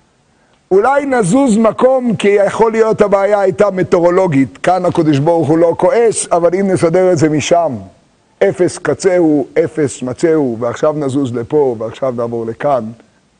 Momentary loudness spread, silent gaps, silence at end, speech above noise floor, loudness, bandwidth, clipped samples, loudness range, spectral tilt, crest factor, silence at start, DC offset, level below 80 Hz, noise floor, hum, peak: 7 LU; none; 0.45 s; 41 dB; -12 LUFS; 10.5 kHz; under 0.1%; 4 LU; -6 dB/octave; 12 dB; 0.7 s; under 0.1%; -48 dBFS; -53 dBFS; none; 0 dBFS